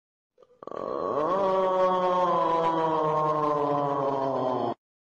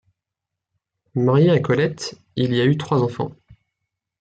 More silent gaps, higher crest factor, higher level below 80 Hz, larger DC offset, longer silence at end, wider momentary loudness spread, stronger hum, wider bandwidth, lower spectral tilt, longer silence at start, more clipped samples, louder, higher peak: neither; about the same, 12 dB vs 16 dB; second, -66 dBFS vs -60 dBFS; neither; second, 0.4 s vs 0.9 s; second, 9 LU vs 13 LU; neither; second, 7.6 kHz vs 9 kHz; about the same, -7 dB/octave vs -7 dB/octave; second, 0.75 s vs 1.15 s; neither; second, -26 LUFS vs -20 LUFS; second, -14 dBFS vs -6 dBFS